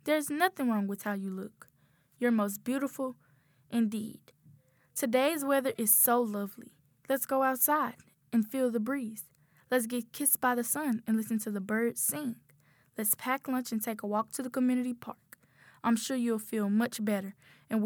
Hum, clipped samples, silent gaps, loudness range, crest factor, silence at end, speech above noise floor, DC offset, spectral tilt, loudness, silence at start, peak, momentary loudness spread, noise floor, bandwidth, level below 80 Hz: none; under 0.1%; none; 6 LU; 20 dB; 0 s; 37 dB; under 0.1%; -4 dB/octave; -31 LUFS; 0.05 s; -12 dBFS; 13 LU; -68 dBFS; over 20 kHz; -82 dBFS